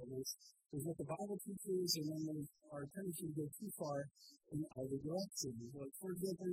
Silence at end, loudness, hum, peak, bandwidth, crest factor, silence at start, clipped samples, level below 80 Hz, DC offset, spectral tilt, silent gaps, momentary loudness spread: 0 s; -45 LUFS; none; -24 dBFS; 16 kHz; 22 dB; 0 s; under 0.1%; -76 dBFS; under 0.1%; -5 dB/octave; none; 11 LU